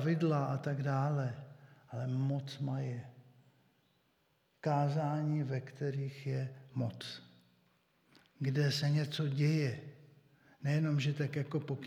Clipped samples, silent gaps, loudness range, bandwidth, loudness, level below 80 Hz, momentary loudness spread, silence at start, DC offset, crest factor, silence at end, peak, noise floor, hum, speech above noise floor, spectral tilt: under 0.1%; none; 6 LU; 11 kHz; -36 LUFS; -84 dBFS; 14 LU; 0 s; under 0.1%; 16 dB; 0 s; -20 dBFS; -75 dBFS; none; 41 dB; -7 dB/octave